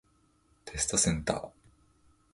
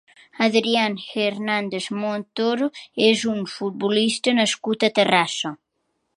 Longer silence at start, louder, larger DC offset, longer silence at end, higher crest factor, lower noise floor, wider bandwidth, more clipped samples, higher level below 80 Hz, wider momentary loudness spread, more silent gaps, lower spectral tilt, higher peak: first, 0.65 s vs 0.35 s; second, -30 LUFS vs -21 LUFS; neither; first, 0.85 s vs 0.65 s; about the same, 24 dB vs 20 dB; second, -68 dBFS vs -73 dBFS; about the same, 11.5 kHz vs 11.5 kHz; neither; first, -50 dBFS vs -70 dBFS; first, 21 LU vs 8 LU; neither; about the same, -3 dB/octave vs -3.5 dB/octave; second, -10 dBFS vs -2 dBFS